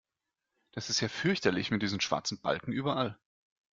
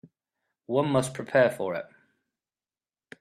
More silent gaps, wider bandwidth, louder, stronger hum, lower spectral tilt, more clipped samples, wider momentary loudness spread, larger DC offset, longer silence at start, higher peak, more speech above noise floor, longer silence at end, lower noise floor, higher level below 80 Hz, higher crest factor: neither; second, 7.8 kHz vs 14 kHz; second, -32 LUFS vs -26 LUFS; neither; second, -4 dB/octave vs -5.5 dB/octave; neither; second, 6 LU vs 12 LU; neither; about the same, 0.75 s vs 0.7 s; about the same, -12 dBFS vs -10 dBFS; second, 56 dB vs over 65 dB; second, 0.6 s vs 1.35 s; about the same, -88 dBFS vs under -90 dBFS; about the same, -66 dBFS vs -68 dBFS; about the same, 22 dB vs 20 dB